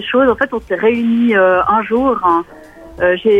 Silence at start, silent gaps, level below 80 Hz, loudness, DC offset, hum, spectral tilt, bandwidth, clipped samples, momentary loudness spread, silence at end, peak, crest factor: 0 s; none; -44 dBFS; -14 LUFS; under 0.1%; none; -7 dB/octave; 5.2 kHz; under 0.1%; 6 LU; 0 s; 0 dBFS; 12 dB